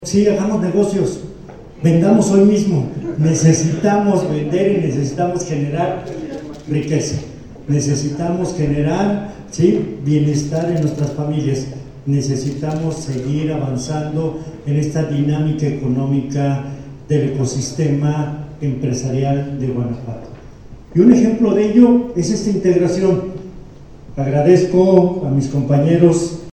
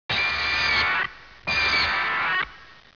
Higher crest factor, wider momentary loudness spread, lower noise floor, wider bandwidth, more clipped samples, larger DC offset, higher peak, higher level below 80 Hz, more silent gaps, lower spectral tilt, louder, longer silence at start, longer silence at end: about the same, 16 dB vs 14 dB; first, 13 LU vs 9 LU; second, -36 dBFS vs -46 dBFS; first, 9.6 kHz vs 5.4 kHz; neither; second, under 0.1% vs 0.2%; first, 0 dBFS vs -12 dBFS; about the same, -42 dBFS vs -46 dBFS; neither; first, -7 dB/octave vs -2.5 dB/octave; first, -16 LUFS vs -22 LUFS; about the same, 0 s vs 0.1 s; second, 0 s vs 0.25 s